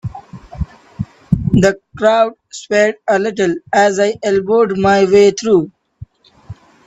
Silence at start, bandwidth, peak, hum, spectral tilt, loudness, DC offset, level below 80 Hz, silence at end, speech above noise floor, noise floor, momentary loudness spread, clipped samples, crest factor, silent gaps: 0.05 s; 8.2 kHz; 0 dBFS; none; -5.5 dB/octave; -14 LUFS; under 0.1%; -38 dBFS; 0.35 s; 25 dB; -38 dBFS; 18 LU; under 0.1%; 14 dB; none